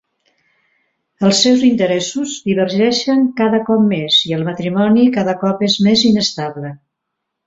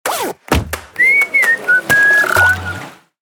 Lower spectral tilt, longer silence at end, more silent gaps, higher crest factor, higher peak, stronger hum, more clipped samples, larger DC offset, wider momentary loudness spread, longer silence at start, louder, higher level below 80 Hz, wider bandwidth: first, -4.5 dB/octave vs -3 dB/octave; first, 0.7 s vs 0.3 s; neither; about the same, 14 dB vs 14 dB; about the same, -2 dBFS vs -2 dBFS; neither; neither; neither; second, 9 LU vs 13 LU; first, 1.2 s vs 0.05 s; about the same, -14 LUFS vs -12 LUFS; second, -56 dBFS vs -34 dBFS; second, 8 kHz vs over 20 kHz